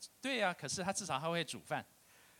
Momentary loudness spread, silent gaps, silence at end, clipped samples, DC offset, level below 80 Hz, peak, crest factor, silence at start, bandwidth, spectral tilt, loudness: 7 LU; none; 0.55 s; under 0.1%; under 0.1%; -76 dBFS; -20 dBFS; 20 dB; 0 s; 17 kHz; -3 dB/octave; -38 LUFS